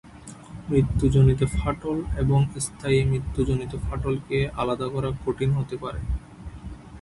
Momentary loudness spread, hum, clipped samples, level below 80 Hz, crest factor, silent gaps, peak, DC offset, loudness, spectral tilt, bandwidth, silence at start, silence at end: 19 LU; none; under 0.1%; -34 dBFS; 18 dB; none; -8 dBFS; under 0.1%; -25 LUFS; -7 dB/octave; 11.5 kHz; 0.05 s; 0 s